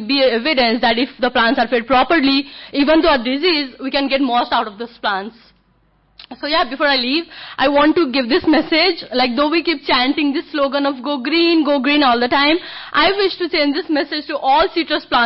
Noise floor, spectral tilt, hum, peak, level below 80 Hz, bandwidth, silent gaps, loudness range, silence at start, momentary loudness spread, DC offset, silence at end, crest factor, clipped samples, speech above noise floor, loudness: -57 dBFS; -8 dB/octave; none; -4 dBFS; -46 dBFS; 5.8 kHz; none; 4 LU; 0 s; 7 LU; under 0.1%; 0 s; 12 dB; under 0.1%; 41 dB; -16 LUFS